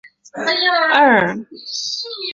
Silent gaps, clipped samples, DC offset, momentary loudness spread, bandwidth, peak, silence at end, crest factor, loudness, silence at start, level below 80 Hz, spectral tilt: none; under 0.1%; under 0.1%; 15 LU; 7.8 kHz; 0 dBFS; 0 s; 18 dB; -16 LUFS; 0.05 s; -62 dBFS; -3 dB/octave